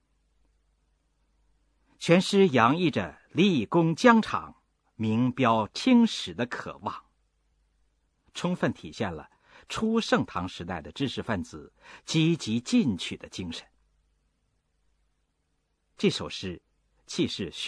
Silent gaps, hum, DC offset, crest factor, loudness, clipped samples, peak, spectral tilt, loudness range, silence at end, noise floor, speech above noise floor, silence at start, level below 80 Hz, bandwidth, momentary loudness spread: none; none; under 0.1%; 24 dB; -26 LUFS; under 0.1%; -4 dBFS; -5.5 dB/octave; 12 LU; 0 s; -75 dBFS; 49 dB; 2 s; -60 dBFS; 11 kHz; 16 LU